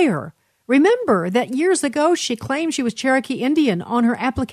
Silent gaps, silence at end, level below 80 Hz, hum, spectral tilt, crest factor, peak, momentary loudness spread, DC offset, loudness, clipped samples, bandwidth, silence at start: none; 0 s; -50 dBFS; none; -4.5 dB/octave; 14 dB; -4 dBFS; 6 LU; under 0.1%; -19 LUFS; under 0.1%; 13.5 kHz; 0 s